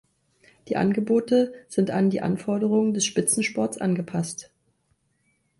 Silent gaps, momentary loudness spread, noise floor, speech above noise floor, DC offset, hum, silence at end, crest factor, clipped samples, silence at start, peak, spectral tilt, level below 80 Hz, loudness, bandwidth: none; 8 LU; -70 dBFS; 46 dB; under 0.1%; none; 1.15 s; 16 dB; under 0.1%; 0.65 s; -8 dBFS; -5 dB/octave; -64 dBFS; -24 LUFS; 12 kHz